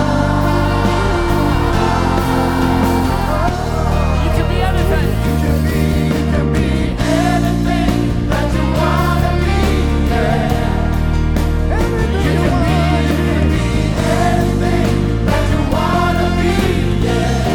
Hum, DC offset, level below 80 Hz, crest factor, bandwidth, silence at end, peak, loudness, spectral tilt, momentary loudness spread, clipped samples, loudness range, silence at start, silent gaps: none; under 0.1%; -20 dBFS; 12 dB; 18.5 kHz; 0 s; -2 dBFS; -15 LUFS; -6.5 dB/octave; 2 LU; under 0.1%; 1 LU; 0 s; none